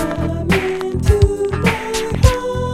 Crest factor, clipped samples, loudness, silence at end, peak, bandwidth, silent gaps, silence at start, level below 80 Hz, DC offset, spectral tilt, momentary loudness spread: 16 dB; under 0.1%; -17 LUFS; 0 s; 0 dBFS; 16 kHz; none; 0 s; -22 dBFS; under 0.1%; -6 dB/octave; 6 LU